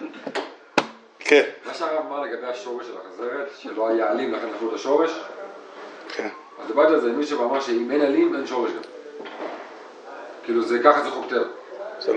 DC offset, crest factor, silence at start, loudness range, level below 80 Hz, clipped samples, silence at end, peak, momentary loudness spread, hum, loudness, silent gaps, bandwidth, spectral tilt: under 0.1%; 22 dB; 0 s; 3 LU; -84 dBFS; under 0.1%; 0 s; -2 dBFS; 20 LU; none; -23 LUFS; none; 9.6 kHz; -4 dB/octave